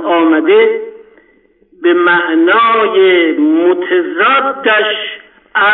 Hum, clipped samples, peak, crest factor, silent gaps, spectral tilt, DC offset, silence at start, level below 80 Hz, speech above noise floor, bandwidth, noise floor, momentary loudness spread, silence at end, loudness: none; under 0.1%; 0 dBFS; 10 dB; none; -9.5 dB/octave; under 0.1%; 0 s; -62 dBFS; 40 dB; 4.1 kHz; -50 dBFS; 10 LU; 0 s; -10 LUFS